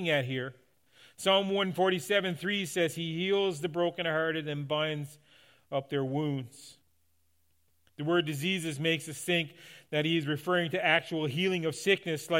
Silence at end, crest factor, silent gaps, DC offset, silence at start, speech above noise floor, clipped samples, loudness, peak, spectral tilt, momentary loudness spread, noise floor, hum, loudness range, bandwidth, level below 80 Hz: 0 s; 20 dB; none; under 0.1%; 0 s; 44 dB; under 0.1%; -30 LUFS; -10 dBFS; -4.5 dB/octave; 9 LU; -75 dBFS; none; 6 LU; 16.5 kHz; -78 dBFS